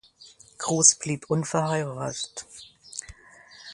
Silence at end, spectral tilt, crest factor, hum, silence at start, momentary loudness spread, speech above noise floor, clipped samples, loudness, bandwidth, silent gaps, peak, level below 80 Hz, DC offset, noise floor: 0 s; -3 dB/octave; 26 dB; none; 0.2 s; 23 LU; 27 dB; under 0.1%; -24 LUFS; 11.5 kHz; none; -2 dBFS; -60 dBFS; under 0.1%; -53 dBFS